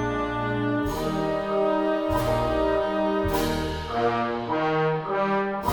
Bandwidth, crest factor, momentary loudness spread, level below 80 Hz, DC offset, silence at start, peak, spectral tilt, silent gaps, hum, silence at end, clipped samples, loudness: 19 kHz; 16 dB; 3 LU; -40 dBFS; under 0.1%; 0 s; -10 dBFS; -6 dB/octave; none; none; 0 s; under 0.1%; -25 LUFS